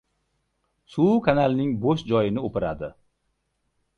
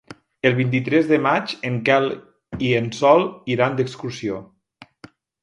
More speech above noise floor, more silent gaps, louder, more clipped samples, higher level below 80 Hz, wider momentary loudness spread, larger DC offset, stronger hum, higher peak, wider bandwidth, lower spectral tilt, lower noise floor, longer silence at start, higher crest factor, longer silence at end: first, 52 dB vs 31 dB; neither; second, -23 LUFS vs -20 LUFS; neither; about the same, -52 dBFS vs -56 dBFS; about the same, 14 LU vs 12 LU; neither; neither; second, -6 dBFS vs 0 dBFS; second, 7 kHz vs 11 kHz; first, -8.5 dB/octave vs -6.5 dB/octave; first, -74 dBFS vs -50 dBFS; first, 0.95 s vs 0.1 s; about the same, 18 dB vs 20 dB; first, 1.1 s vs 0.95 s